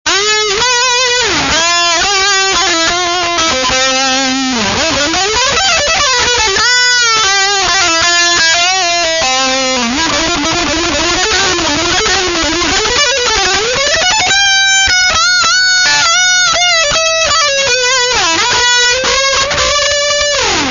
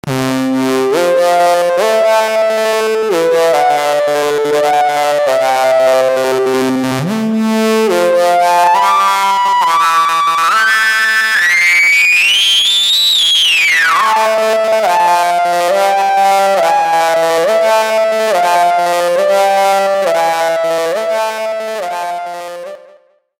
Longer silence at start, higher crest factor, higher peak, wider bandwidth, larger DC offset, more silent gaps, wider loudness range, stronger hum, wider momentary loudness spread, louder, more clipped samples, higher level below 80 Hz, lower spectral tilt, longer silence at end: about the same, 0.05 s vs 0.05 s; about the same, 10 dB vs 12 dB; about the same, 0 dBFS vs 0 dBFS; second, 7.4 kHz vs 17 kHz; neither; neither; about the same, 3 LU vs 5 LU; neither; second, 4 LU vs 8 LU; about the same, -9 LUFS vs -11 LUFS; neither; first, -34 dBFS vs -60 dBFS; second, -0.5 dB/octave vs -2.5 dB/octave; second, 0 s vs 0.6 s